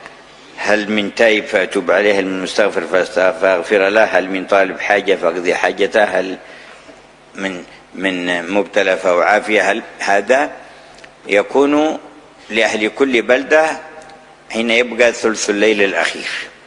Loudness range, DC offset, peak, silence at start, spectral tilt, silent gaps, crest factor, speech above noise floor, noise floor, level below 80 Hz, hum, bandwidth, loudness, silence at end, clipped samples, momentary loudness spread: 4 LU; under 0.1%; 0 dBFS; 0 s; -3.5 dB/octave; none; 16 dB; 27 dB; -42 dBFS; -56 dBFS; none; 11 kHz; -15 LUFS; 0.15 s; under 0.1%; 10 LU